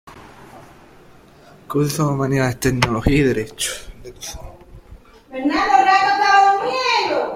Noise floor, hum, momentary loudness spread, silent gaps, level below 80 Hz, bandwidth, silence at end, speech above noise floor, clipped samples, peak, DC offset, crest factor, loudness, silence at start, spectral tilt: -46 dBFS; none; 19 LU; none; -38 dBFS; 16.5 kHz; 0 s; 29 dB; under 0.1%; 0 dBFS; under 0.1%; 18 dB; -17 LUFS; 0.05 s; -4.5 dB/octave